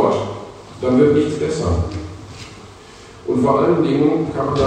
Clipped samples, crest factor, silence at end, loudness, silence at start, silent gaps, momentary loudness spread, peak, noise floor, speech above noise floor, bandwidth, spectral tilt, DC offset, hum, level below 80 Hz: under 0.1%; 16 dB; 0 s; -17 LUFS; 0 s; none; 20 LU; -2 dBFS; -40 dBFS; 24 dB; 9.8 kHz; -7.5 dB/octave; under 0.1%; none; -38 dBFS